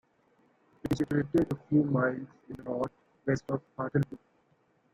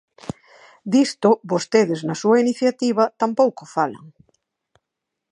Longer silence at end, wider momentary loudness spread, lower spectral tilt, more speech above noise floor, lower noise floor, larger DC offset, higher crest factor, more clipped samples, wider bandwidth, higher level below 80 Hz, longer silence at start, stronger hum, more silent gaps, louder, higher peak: second, 0.8 s vs 1.25 s; second, 14 LU vs 18 LU; first, -8.5 dB/octave vs -5.5 dB/octave; second, 39 dB vs 63 dB; second, -69 dBFS vs -82 dBFS; neither; about the same, 18 dB vs 18 dB; neither; first, 14.5 kHz vs 11 kHz; first, -60 dBFS vs -66 dBFS; first, 0.85 s vs 0.25 s; neither; neither; second, -31 LUFS vs -19 LUFS; second, -14 dBFS vs -2 dBFS